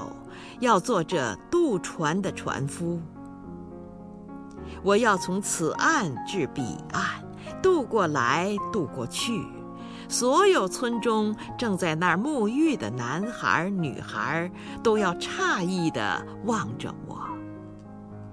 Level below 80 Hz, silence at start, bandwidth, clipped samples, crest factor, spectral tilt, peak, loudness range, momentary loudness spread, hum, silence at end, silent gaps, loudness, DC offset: -56 dBFS; 0 s; 11 kHz; under 0.1%; 20 dB; -4.5 dB/octave; -8 dBFS; 4 LU; 18 LU; none; 0 s; none; -26 LUFS; under 0.1%